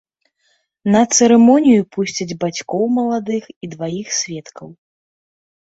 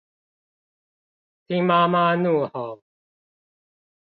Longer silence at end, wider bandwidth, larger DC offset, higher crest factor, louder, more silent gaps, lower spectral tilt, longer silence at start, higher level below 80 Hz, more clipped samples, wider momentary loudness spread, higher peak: second, 1.05 s vs 1.4 s; first, 8 kHz vs 4.9 kHz; neither; about the same, 16 dB vs 20 dB; first, -16 LUFS vs -21 LUFS; first, 3.56-3.61 s vs none; second, -4.5 dB/octave vs -10 dB/octave; second, 0.85 s vs 1.5 s; first, -60 dBFS vs -74 dBFS; neither; first, 16 LU vs 13 LU; first, -2 dBFS vs -6 dBFS